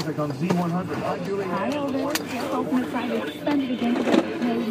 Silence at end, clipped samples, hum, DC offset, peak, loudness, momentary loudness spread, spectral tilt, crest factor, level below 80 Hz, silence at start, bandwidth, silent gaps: 0 s; under 0.1%; none; under 0.1%; -6 dBFS; -25 LUFS; 5 LU; -6 dB/octave; 20 dB; -62 dBFS; 0 s; 15.5 kHz; none